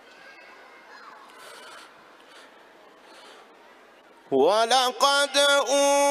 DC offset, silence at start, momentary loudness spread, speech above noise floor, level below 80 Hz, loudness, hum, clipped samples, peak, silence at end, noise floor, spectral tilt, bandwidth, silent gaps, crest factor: under 0.1%; 1.05 s; 25 LU; 32 dB; -80 dBFS; -21 LUFS; none; under 0.1%; -6 dBFS; 0 s; -53 dBFS; -0.5 dB/octave; 15 kHz; none; 20 dB